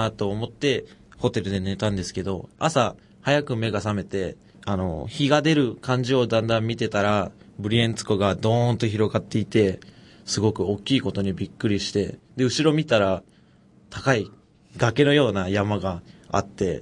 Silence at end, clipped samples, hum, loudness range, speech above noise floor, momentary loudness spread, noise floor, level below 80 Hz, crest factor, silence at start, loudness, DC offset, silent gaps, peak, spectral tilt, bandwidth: 0 s; under 0.1%; none; 3 LU; 32 dB; 9 LU; -55 dBFS; -54 dBFS; 20 dB; 0 s; -24 LUFS; under 0.1%; none; -4 dBFS; -5.5 dB/octave; 11 kHz